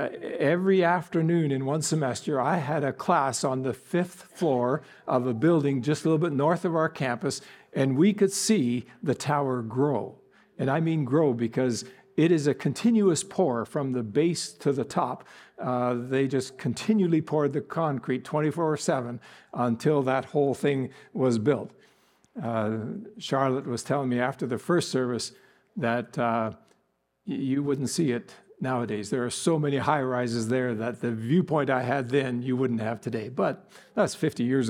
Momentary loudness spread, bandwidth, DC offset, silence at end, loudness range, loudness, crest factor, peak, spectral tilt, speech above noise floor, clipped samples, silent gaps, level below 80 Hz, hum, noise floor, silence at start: 9 LU; 16 kHz; under 0.1%; 0 s; 4 LU; -27 LUFS; 18 dB; -8 dBFS; -6 dB/octave; 46 dB; under 0.1%; none; -72 dBFS; none; -73 dBFS; 0 s